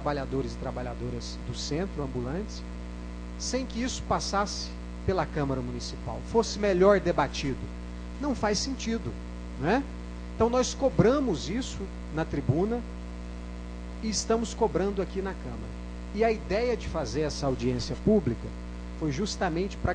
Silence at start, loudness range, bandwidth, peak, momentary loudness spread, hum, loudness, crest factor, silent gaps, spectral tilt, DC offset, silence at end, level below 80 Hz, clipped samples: 0 s; 5 LU; 10 kHz; -8 dBFS; 15 LU; 60 Hz at -40 dBFS; -29 LUFS; 20 dB; none; -5.5 dB/octave; under 0.1%; 0 s; -40 dBFS; under 0.1%